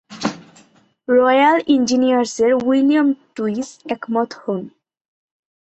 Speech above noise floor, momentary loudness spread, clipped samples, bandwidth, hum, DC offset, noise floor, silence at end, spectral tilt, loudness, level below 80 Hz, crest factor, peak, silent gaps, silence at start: 37 dB; 13 LU; under 0.1%; 8.2 kHz; none; under 0.1%; -53 dBFS; 1 s; -4.5 dB/octave; -17 LUFS; -62 dBFS; 16 dB; -2 dBFS; none; 0.1 s